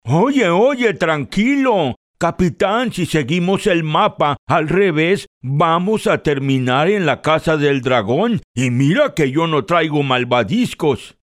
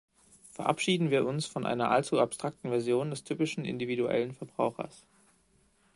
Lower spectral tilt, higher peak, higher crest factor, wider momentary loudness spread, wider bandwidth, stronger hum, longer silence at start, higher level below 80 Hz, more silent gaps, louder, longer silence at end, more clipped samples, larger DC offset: about the same, -6 dB/octave vs -5.5 dB/octave; first, 0 dBFS vs -10 dBFS; second, 14 dB vs 22 dB; second, 5 LU vs 9 LU; first, 14.5 kHz vs 11.5 kHz; neither; second, 0.05 s vs 0.55 s; first, -46 dBFS vs -70 dBFS; first, 1.96-2.14 s, 4.38-4.47 s, 5.27-5.41 s, 8.44-8.54 s vs none; first, -16 LUFS vs -31 LUFS; second, 0.15 s vs 1 s; neither; neither